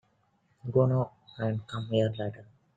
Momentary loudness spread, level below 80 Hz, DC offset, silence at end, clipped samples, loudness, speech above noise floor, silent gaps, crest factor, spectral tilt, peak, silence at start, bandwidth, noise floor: 12 LU; -64 dBFS; under 0.1%; 0.35 s; under 0.1%; -30 LUFS; 41 dB; none; 18 dB; -8.5 dB/octave; -12 dBFS; 0.65 s; 7.8 kHz; -70 dBFS